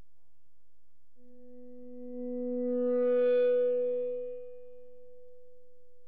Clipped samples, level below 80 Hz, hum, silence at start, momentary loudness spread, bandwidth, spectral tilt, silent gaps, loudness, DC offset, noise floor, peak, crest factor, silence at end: under 0.1%; -78 dBFS; none; 1.45 s; 23 LU; 3.7 kHz; -8 dB/octave; none; -30 LUFS; 0.7%; -78 dBFS; -20 dBFS; 12 dB; 1.2 s